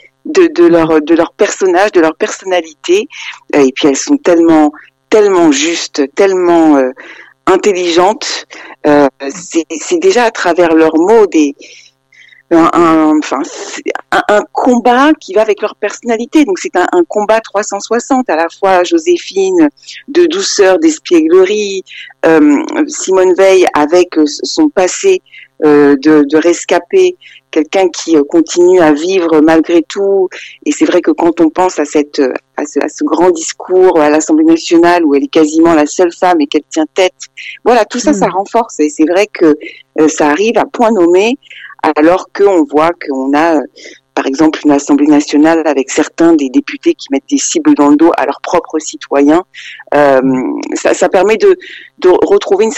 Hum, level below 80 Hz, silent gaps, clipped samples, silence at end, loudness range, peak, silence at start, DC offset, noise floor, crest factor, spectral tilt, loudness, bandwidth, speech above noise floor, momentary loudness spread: none; -48 dBFS; none; under 0.1%; 0 s; 3 LU; 0 dBFS; 0.25 s; under 0.1%; -42 dBFS; 10 dB; -4 dB/octave; -10 LUFS; 9.8 kHz; 33 dB; 9 LU